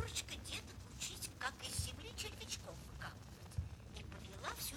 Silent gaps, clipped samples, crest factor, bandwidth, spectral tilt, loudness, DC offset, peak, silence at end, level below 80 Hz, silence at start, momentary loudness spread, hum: none; under 0.1%; 20 dB; 19.5 kHz; -2.5 dB/octave; -47 LUFS; under 0.1%; -28 dBFS; 0 s; -56 dBFS; 0 s; 9 LU; none